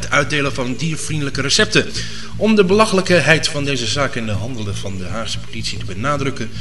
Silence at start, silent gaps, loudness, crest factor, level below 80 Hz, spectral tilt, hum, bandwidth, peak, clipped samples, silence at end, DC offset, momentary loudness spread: 0 s; none; -17 LUFS; 18 dB; -38 dBFS; -4 dB/octave; none; 11.5 kHz; 0 dBFS; under 0.1%; 0 s; 5%; 12 LU